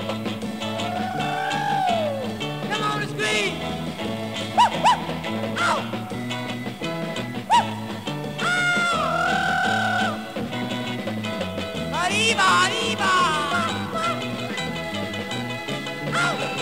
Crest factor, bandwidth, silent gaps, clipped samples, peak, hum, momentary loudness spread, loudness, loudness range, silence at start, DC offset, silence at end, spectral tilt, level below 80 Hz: 18 dB; 16 kHz; none; under 0.1%; -6 dBFS; none; 10 LU; -23 LUFS; 4 LU; 0 s; 0.3%; 0 s; -3.5 dB/octave; -54 dBFS